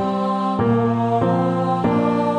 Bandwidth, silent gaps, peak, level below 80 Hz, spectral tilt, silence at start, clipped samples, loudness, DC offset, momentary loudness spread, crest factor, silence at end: 9.2 kHz; none; -6 dBFS; -50 dBFS; -8.5 dB/octave; 0 s; under 0.1%; -19 LUFS; under 0.1%; 2 LU; 12 dB; 0 s